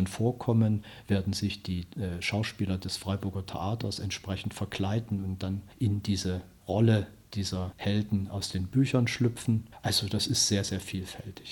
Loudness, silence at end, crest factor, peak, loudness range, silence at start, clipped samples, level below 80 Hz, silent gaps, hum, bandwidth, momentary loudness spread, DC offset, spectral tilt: -30 LUFS; 0 s; 18 dB; -12 dBFS; 5 LU; 0 s; under 0.1%; -54 dBFS; none; none; 18 kHz; 10 LU; under 0.1%; -5 dB/octave